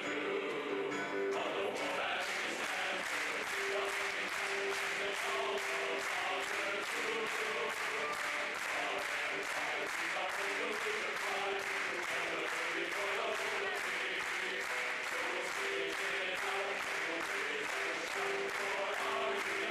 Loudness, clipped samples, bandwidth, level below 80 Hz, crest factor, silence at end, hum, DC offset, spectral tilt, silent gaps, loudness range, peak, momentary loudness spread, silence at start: -36 LUFS; under 0.1%; 15 kHz; -76 dBFS; 12 dB; 0 s; none; under 0.1%; -1.5 dB/octave; none; 0 LU; -26 dBFS; 1 LU; 0 s